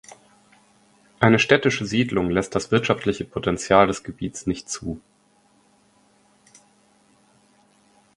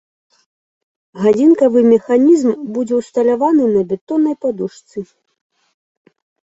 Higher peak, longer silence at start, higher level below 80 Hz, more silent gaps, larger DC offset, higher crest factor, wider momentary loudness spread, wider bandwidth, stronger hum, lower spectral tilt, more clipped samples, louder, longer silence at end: about the same, 0 dBFS vs -2 dBFS; about the same, 1.2 s vs 1.15 s; first, -50 dBFS vs -60 dBFS; second, none vs 4.01-4.07 s; neither; first, 24 dB vs 14 dB; about the same, 13 LU vs 14 LU; first, 11.5 kHz vs 8 kHz; neither; second, -5 dB/octave vs -7.5 dB/octave; neither; second, -21 LUFS vs -14 LUFS; first, 3.2 s vs 1.55 s